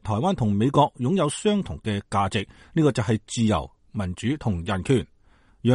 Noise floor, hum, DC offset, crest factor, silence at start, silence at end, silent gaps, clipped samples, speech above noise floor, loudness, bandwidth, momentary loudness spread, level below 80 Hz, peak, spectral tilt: -57 dBFS; none; under 0.1%; 18 dB; 0.05 s; 0 s; none; under 0.1%; 34 dB; -24 LUFS; 11.5 kHz; 8 LU; -46 dBFS; -6 dBFS; -6.5 dB/octave